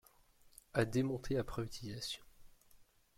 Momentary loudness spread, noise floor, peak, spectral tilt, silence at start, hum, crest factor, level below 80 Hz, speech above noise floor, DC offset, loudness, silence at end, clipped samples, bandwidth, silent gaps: 9 LU; -66 dBFS; -20 dBFS; -5.5 dB/octave; 0.45 s; none; 20 dB; -58 dBFS; 28 dB; under 0.1%; -40 LUFS; 0.35 s; under 0.1%; 16.5 kHz; none